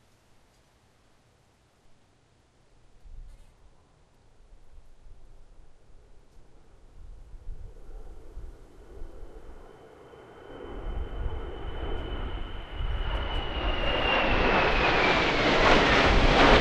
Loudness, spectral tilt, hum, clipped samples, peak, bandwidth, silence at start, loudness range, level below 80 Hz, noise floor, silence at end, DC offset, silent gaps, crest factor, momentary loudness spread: -25 LUFS; -5 dB/octave; none; under 0.1%; -4 dBFS; 9 kHz; 3.05 s; 27 LU; -34 dBFS; -63 dBFS; 0 s; under 0.1%; none; 24 dB; 29 LU